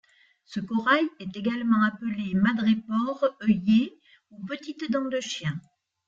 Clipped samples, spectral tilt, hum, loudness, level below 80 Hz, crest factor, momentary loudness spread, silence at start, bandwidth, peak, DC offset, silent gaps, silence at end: under 0.1%; -6 dB/octave; none; -26 LUFS; -64 dBFS; 18 dB; 13 LU; 0.5 s; 7.6 kHz; -8 dBFS; under 0.1%; none; 0.5 s